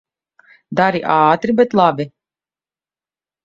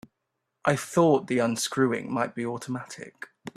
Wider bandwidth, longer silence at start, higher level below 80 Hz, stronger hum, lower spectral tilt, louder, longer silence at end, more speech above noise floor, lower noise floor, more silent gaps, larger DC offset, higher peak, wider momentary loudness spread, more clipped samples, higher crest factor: second, 7.6 kHz vs 14.5 kHz; about the same, 0.7 s vs 0.65 s; first, -58 dBFS vs -68 dBFS; neither; first, -7.5 dB/octave vs -5 dB/octave; first, -15 LUFS vs -26 LUFS; first, 1.35 s vs 0.05 s; first, over 76 dB vs 55 dB; first, under -90 dBFS vs -81 dBFS; neither; neither; first, 0 dBFS vs -8 dBFS; second, 11 LU vs 18 LU; neither; about the same, 18 dB vs 20 dB